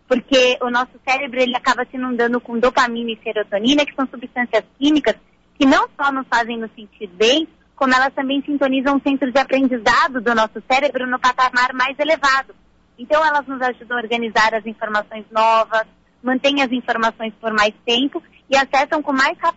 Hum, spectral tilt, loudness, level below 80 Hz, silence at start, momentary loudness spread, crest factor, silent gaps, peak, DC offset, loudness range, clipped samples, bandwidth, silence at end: none; -3 dB/octave; -18 LUFS; -52 dBFS; 0.1 s; 9 LU; 12 dB; none; -6 dBFS; under 0.1%; 2 LU; under 0.1%; 8 kHz; 0.05 s